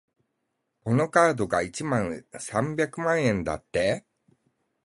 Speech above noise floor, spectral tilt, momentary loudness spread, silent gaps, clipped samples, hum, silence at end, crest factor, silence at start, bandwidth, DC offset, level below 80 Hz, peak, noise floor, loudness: 53 dB; -5.5 dB/octave; 11 LU; none; under 0.1%; none; 0.85 s; 22 dB; 0.85 s; 11.5 kHz; under 0.1%; -54 dBFS; -6 dBFS; -79 dBFS; -26 LUFS